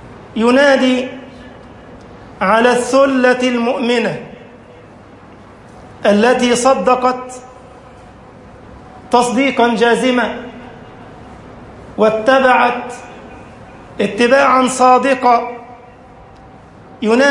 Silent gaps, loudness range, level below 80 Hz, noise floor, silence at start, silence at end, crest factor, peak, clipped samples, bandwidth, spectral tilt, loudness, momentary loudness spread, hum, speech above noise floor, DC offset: none; 3 LU; -48 dBFS; -39 dBFS; 0.05 s; 0 s; 14 dB; 0 dBFS; under 0.1%; 11.5 kHz; -4 dB/octave; -13 LUFS; 22 LU; none; 27 dB; under 0.1%